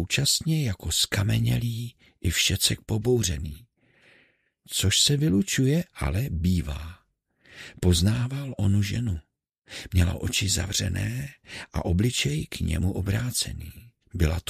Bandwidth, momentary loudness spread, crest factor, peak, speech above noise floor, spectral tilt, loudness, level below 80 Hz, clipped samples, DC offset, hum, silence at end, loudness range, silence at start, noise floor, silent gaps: 15.5 kHz; 15 LU; 20 dB; -6 dBFS; 39 dB; -4 dB/octave; -25 LUFS; -38 dBFS; under 0.1%; under 0.1%; none; 0.1 s; 3 LU; 0 s; -65 dBFS; none